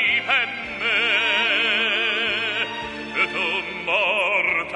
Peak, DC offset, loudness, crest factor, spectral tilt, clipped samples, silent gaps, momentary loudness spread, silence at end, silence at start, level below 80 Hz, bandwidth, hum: -6 dBFS; under 0.1%; -20 LUFS; 16 dB; -2.5 dB/octave; under 0.1%; none; 7 LU; 0 s; 0 s; -56 dBFS; 10.5 kHz; none